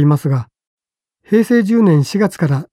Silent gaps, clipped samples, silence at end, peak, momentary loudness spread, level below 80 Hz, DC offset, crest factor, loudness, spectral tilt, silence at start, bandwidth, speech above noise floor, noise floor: 0.67-0.78 s; under 0.1%; 0.1 s; -2 dBFS; 7 LU; -58 dBFS; under 0.1%; 12 dB; -14 LUFS; -8 dB/octave; 0 s; 14 kHz; 49 dB; -62 dBFS